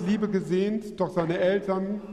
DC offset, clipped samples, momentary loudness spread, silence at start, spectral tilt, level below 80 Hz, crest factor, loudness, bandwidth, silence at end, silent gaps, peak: under 0.1%; under 0.1%; 5 LU; 0 s; -7.5 dB/octave; -58 dBFS; 14 dB; -27 LUFS; 11.5 kHz; 0 s; none; -12 dBFS